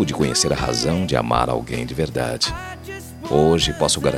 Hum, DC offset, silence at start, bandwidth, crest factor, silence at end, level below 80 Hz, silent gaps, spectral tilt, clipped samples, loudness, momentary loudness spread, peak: none; under 0.1%; 0 s; 16.5 kHz; 18 dB; 0 s; -38 dBFS; none; -4 dB/octave; under 0.1%; -20 LUFS; 15 LU; -2 dBFS